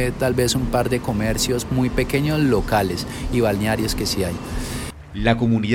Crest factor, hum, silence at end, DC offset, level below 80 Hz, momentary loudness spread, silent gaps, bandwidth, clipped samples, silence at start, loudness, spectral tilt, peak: 16 dB; none; 0 s; under 0.1%; -32 dBFS; 9 LU; none; 17 kHz; under 0.1%; 0 s; -21 LUFS; -5 dB/octave; -4 dBFS